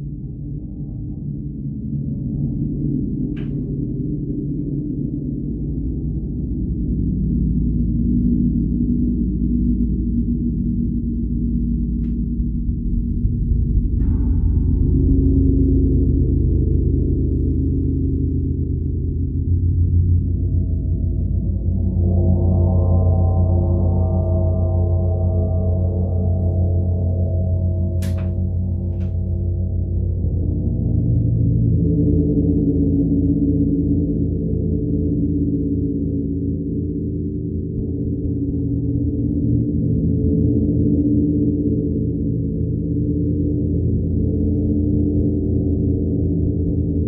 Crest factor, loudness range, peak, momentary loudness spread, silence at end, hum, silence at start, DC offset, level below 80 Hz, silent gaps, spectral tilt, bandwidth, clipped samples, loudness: 14 dB; 6 LU; -4 dBFS; 7 LU; 0 s; none; 0 s; under 0.1%; -24 dBFS; none; -13 dB/octave; 1.2 kHz; under 0.1%; -20 LUFS